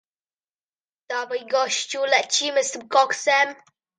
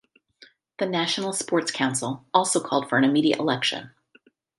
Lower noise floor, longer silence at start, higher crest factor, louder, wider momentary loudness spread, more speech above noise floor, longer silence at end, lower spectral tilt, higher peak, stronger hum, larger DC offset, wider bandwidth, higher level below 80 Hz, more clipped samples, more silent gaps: first, under -90 dBFS vs -60 dBFS; first, 1.1 s vs 0.8 s; about the same, 20 dB vs 22 dB; about the same, -22 LUFS vs -24 LUFS; about the same, 8 LU vs 6 LU; first, over 68 dB vs 37 dB; second, 0.45 s vs 0.7 s; second, 0.5 dB/octave vs -3.5 dB/octave; about the same, -4 dBFS vs -2 dBFS; neither; neither; second, 9.8 kHz vs 11.5 kHz; second, -82 dBFS vs -72 dBFS; neither; neither